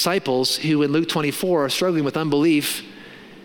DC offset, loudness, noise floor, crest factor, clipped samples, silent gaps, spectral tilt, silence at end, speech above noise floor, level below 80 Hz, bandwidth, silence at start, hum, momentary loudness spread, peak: under 0.1%; -20 LUFS; -42 dBFS; 14 dB; under 0.1%; none; -4.5 dB/octave; 0 s; 21 dB; -62 dBFS; 17.5 kHz; 0 s; none; 8 LU; -6 dBFS